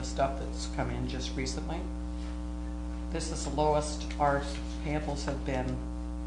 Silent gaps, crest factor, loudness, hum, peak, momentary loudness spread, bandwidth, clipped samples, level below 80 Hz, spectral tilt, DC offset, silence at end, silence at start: none; 18 dB; -34 LUFS; none; -14 dBFS; 9 LU; 10 kHz; under 0.1%; -38 dBFS; -5.5 dB/octave; under 0.1%; 0 s; 0 s